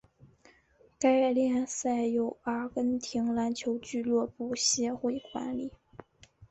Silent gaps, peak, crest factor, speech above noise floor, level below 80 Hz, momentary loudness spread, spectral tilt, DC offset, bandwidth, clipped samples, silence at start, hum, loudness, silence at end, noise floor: none; -14 dBFS; 18 dB; 34 dB; -66 dBFS; 9 LU; -3 dB/octave; under 0.1%; 8.2 kHz; under 0.1%; 1 s; none; -30 LUFS; 0.05 s; -64 dBFS